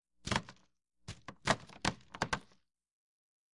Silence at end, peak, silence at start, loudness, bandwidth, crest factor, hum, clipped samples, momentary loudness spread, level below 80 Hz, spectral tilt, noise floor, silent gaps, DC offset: 1.15 s; -14 dBFS; 0.25 s; -38 LUFS; 11.5 kHz; 28 dB; none; under 0.1%; 17 LU; -58 dBFS; -3.5 dB/octave; -73 dBFS; none; under 0.1%